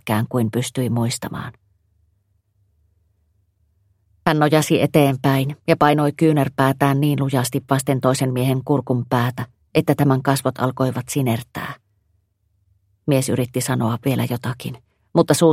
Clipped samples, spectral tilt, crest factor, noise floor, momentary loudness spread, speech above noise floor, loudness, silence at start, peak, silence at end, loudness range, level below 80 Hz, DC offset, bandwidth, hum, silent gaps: under 0.1%; -6 dB/octave; 20 dB; -66 dBFS; 12 LU; 47 dB; -19 LUFS; 0.05 s; 0 dBFS; 0 s; 9 LU; -56 dBFS; under 0.1%; 16 kHz; none; none